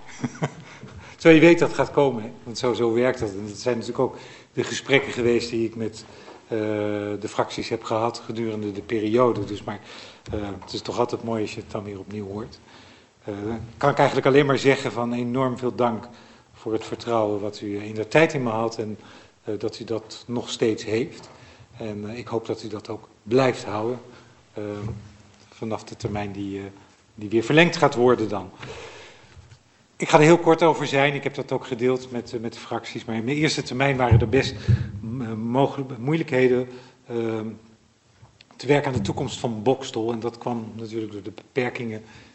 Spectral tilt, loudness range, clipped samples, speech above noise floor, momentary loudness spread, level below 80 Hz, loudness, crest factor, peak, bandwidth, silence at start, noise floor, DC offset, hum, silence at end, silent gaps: -6 dB/octave; 8 LU; under 0.1%; 34 dB; 17 LU; -50 dBFS; -24 LUFS; 24 dB; 0 dBFS; 8.4 kHz; 0 s; -57 dBFS; under 0.1%; none; 0.15 s; none